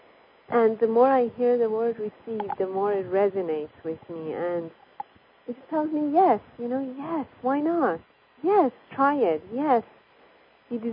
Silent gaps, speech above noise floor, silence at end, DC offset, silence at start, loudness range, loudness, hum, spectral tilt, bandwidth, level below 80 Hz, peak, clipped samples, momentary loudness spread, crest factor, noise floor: none; 32 dB; 0 s; under 0.1%; 0.5 s; 5 LU; -25 LUFS; none; -10.5 dB/octave; 5.2 kHz; -70 dBFS; -8 dBFS; under 0.1%; 15 LU; 18 dB; -57 dBFS